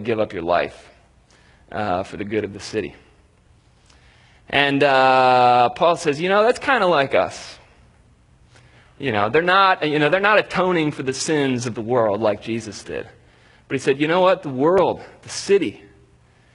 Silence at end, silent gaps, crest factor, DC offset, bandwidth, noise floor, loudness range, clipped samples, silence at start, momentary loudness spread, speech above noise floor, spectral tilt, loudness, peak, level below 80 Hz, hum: 0.8 s; none; 20 dB; under 0.1%; 11 kHz; -55 dBFS; 9 LU; under 0.1%; 0 s; 14 LU; 36 dB; -4.5 dB/octave; -19 LUFS; 0 dBFS; -56 dBFS; none